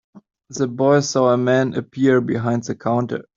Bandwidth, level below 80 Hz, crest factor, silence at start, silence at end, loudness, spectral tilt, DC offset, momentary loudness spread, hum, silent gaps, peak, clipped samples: 7.6 kHz; -60 dBFS; 16 dB; 0.15 s; 0.15 s; -19 LUFS; -6 dB/octave; under 0.1%; 8 LU; none; none; -2 dBFS; under 0.1%